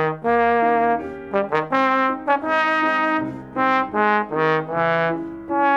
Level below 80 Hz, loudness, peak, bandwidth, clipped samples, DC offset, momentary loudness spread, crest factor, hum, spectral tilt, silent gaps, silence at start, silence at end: -56 dBFS; -20 LUFS; -4 dBFS; 7.8 kHz; under 0.1%; under 0.1%; 7 LU; 16 dB; none; -7 dB/octave; none; 0 s; 0 s